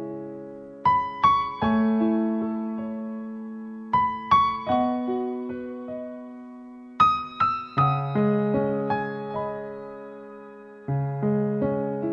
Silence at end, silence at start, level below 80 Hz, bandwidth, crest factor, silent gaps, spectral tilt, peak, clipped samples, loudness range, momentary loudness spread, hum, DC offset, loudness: 0 s; 0 s; -56 dBFS; 6.8 kHz; 20 dB; none; -8.5 dB/octave; -6 dBFS; under 0.1%; 4 LU; 19 LU; none; under 0.1%; -25 LUFS